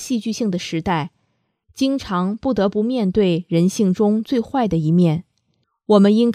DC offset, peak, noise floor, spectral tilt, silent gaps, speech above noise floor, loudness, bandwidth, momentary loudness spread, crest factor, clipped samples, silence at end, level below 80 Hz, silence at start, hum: under 0.1%; 0 dBFS; -68 dBFS; -7 dB/octave; none; 51 dB; -19 LUFS; 13.5 kHz; 7 LU; 18 dB; under 0.1%; 0 s; -48 dBFS; 0 s; none